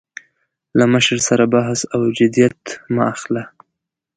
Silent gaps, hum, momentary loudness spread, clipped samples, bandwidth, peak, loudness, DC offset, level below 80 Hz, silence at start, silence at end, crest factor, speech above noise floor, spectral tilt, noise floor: none; none; 11 LU; under 0.1%; 9.4 kHz; 0 dBFS; -16 LUFS; under 0.1%; -56 dBFS; 0.75 s; 0.7 s; 18 dB; 63 dB; -4.5 dB/octave; -79 dBFS